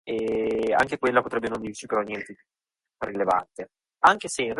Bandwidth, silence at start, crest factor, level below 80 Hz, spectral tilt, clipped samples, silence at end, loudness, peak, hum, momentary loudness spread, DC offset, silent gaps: 11.5 kHz; 0.05 s; 20 dB; -58 dBFS; -4 dB/octave; under 0.1%; 0 s; -25 LUFS; -6 dBFS; none; 17 LU; under 0.1%; none